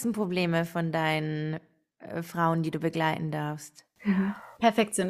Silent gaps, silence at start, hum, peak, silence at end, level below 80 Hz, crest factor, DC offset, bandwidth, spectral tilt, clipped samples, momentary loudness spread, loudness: none; 0 s; none; -8 dBFS; 0 s; -66 dBFS; 20 dB; under 0.1%; 15 kHz; -5.5 dB/octave; under 0.1%; 11 LU; -29 LUFS